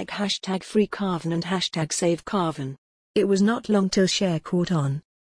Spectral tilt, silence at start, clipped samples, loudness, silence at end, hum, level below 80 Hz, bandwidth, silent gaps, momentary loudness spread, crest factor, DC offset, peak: -5 dB/octave; 0 s; under 0.1%; -24 LUFS; 0.2 s; none; -56 dBFS; 10.5 kHz; 2.78-3.14 s; 6 LU; 14 dB; under 0.1%; -10 dBFS